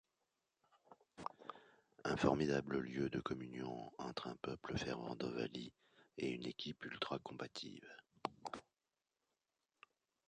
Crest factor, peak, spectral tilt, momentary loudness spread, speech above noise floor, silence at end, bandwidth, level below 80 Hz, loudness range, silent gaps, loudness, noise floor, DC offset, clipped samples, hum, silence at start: 28 dB; -18 dBFS; -5.5 dB/octave; 17 LU; over 47 dB; 1.7 s; 10 kHz; -68 dBFS; 7 LU; none; -44 LUFS; under -90 dBFS; under 0.1%; under 0.1%; none; 0.9 s